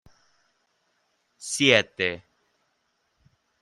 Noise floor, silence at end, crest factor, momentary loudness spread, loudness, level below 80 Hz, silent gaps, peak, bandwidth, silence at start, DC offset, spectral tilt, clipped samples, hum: -73 dBFS; 1.45 s; 26 dB; 21 LU; -22 LUFS; -70 dBFS; none; -2 dBFS; 15 kHz; 1.4 s; under 0.1%; -3 dB/octave; under 0.1%; none